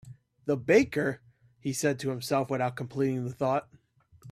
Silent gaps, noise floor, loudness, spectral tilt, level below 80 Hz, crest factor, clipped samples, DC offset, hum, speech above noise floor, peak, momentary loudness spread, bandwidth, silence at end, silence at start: none; -56 dBFS; -29 LUFS; -5.5 dB/octave; -66 dBFS; 20 dB; under 0.1%; under 0.1%; none; 28 dB; -10 dBFS; 11 LU; 15 kHz; 0 s; 0.05 s